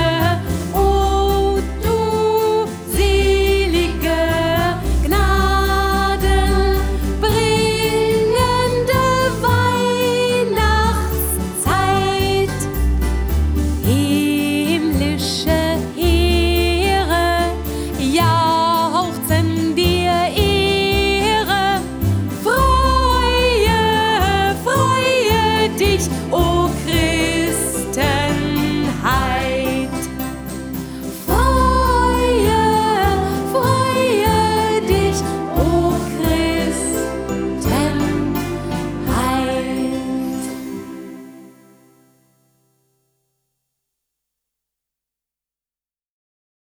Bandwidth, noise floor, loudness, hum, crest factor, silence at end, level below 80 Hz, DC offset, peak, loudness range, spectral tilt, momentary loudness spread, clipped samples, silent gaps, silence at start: over 20 kHz; under -90 dBFS; -17 LUFS; none; 14 dB; 5.3 s; -24 dBFS; under 0.1%; -4 dBFS; 4 LU; -5 dB/octave; 7 LU; under 0.1%; none; 0 s